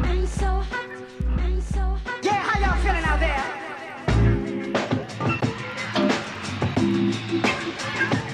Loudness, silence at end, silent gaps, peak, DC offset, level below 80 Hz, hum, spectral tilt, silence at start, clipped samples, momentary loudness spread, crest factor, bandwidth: -24 LUFS; 0 s; none; -6 dBFS; under 0.1%; -28 dBFS; none; -6 dB/octave; 0 s; under 0.1%; 8 LU; 16 dB; 10.5 kHz